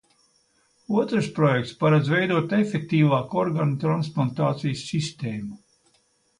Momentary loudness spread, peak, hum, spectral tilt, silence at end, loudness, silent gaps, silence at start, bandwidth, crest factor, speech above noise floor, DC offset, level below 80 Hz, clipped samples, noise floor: 8 LU; -8 dBFS; none; -7 dB/octave; 0.85 s; -23 LUFS; none; 0.9 s; 10.5 kHz; 16 dB; 43 dB; under 0.1%; -62 dBFS; under 0.1%; -66 dBFS